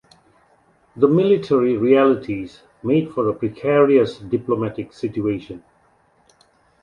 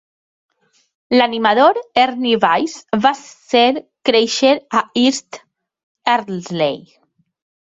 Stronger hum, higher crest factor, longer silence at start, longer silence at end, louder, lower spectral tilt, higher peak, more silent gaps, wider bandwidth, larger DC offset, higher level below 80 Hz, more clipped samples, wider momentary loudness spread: neither; about the same, 18 dB vs 16 dB; second, 0.95 s vs 1.1 s; first, 1.25 s vs 0.85 s; second, -19 LUFS vs -16 LUFS; first, -8.5 dB/octave vs -3.5 dB/octave; about the same, -2 dBFS vs -2 dBFS; second, none vs 5.83-5.95 s; second, 7 kHz vs 8.2 kHz; neither; first, -56 dBFS vs -62 dBFS; neither; first, 14 LU vs 11 LU